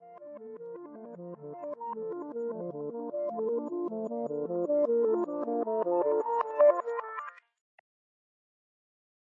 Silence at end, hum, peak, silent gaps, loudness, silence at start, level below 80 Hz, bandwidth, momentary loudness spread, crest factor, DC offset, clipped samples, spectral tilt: 1.85 s; none; -12 dBFS; none; -31 LUFS; 0 s; -88 dBFS; 7.2 kHz; 19 LU; 20 dB; under 0.1%; under 0.1%; -9 dB/octave